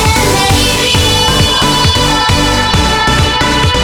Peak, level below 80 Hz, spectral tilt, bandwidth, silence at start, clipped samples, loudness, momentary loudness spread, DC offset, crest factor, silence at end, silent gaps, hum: 0 dBFS; -20 dBFS; -3.5 dB/octave; over 20 kHz; 0 s; under 0.1%; -9 LUFS; 1 LU; under 0.1%; 10 dB; 0 s; none; none